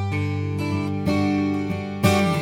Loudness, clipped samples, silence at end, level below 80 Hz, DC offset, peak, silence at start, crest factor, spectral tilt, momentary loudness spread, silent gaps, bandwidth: -23 LUFS; under 0.1%; 0 s; -52 dBFS; under 0.1%; -6 dBFS; 0 s; 16 dB; -6.5 dB/octave; 6 LU; none; 18.5 kHz